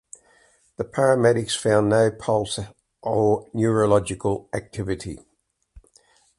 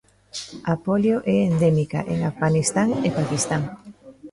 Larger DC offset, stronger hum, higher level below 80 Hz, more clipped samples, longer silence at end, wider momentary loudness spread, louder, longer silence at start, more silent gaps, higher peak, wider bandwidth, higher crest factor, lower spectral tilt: neither; neither; about the same, -50 dBFS vs -52 dBFS; neither; first, 0.6 s vs 0.05 s; about the same, 14 LU vs 14 LU; about the same, -22 LUFS vs -22 LUFS; first, 0.8 s vs 0.35 s; neither; first, -4 dBFS vs -8 dBFS; about the same, 11.5 kHz vs 11.5 kHz; about the same, 18 dB vs 16 dB; about the same, -5.5 dB/octave vs -6 dB/octave